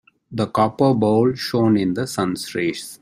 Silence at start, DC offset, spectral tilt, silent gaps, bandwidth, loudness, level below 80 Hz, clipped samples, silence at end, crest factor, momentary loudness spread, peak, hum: 0.3 s; under 0.1%; -6 dB/octave; none; 16 kHz; -20 LUFS; -56 dBFS; under 0.1%; 0.05 s; 16 dB; 7 LU; -4 dBFS; none